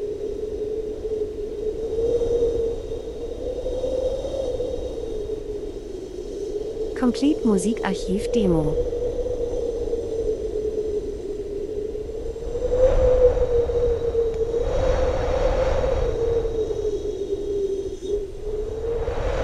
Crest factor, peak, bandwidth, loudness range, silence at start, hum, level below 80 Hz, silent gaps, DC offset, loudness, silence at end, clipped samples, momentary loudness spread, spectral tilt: 18 dB; -6 dBFS; 12 kHz; 6 LU; 0 s; none; -32 dBFS; none; under 0.1%; -25 LUFS; 0 s; under 0.1%; 10 LU; -6.5 dB/octave